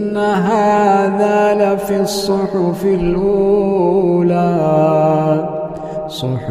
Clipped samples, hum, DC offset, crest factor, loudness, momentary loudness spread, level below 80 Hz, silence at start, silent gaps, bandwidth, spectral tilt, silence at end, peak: under 0.1%; none; under 0.1%; 12 dB; -14 LUFS; 9 LU; -40 dBFS; 0 s; none; 15.5 kHz; -7 dB/octave; 0 s; -2 dBFS